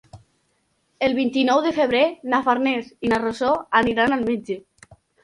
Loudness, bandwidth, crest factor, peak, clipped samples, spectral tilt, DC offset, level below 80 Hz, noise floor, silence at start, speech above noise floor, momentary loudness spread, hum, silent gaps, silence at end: -21 LUFS; 11.5 kHz; 18 dB; -4 dBFS; under 0.1%; -5 dB/octave; under 0.1%; -54 dBFS; -68 dBFS; 0.15 s; 48 dB; 6 LU; none; none; 0.65 s